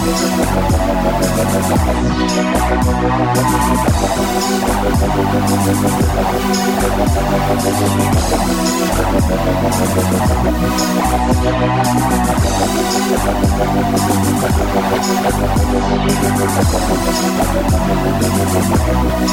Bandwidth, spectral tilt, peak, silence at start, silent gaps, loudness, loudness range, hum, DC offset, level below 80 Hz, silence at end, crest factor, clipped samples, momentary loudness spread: 17 kHz; -5 dB/octave; -4 dBFS; 0 s; none; -15 LUFS; 0 LU; none; 0.2%; -22 dBFS; 0 s; 10 dB; under 0.1%; 1 LU